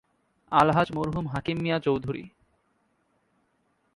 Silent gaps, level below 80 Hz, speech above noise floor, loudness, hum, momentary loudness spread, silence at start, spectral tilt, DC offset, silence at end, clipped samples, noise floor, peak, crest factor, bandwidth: none; -54 dBFS; 46 dB; -26 LUFS; none; 9 LU; 0.5 s; -7.5 dB/octave; under 0.1%; 1.7 s; under 0.1%; -71 dBFS; -6 dBFS; 24 dB; 11.5 kHz